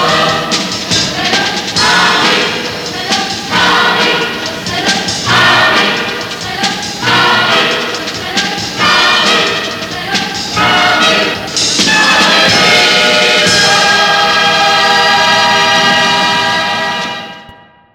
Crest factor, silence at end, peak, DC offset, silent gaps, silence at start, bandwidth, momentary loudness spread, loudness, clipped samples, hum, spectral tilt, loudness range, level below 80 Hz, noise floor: 10 dB; 0.4 s; 0 dBFS; under 0.1%; none; 0 s; 20 kHz; 9 LU; -9 LUFS; under 0.1%; none; -2 dB/octave; 4 LU; -44 dBFS; -38 dBFS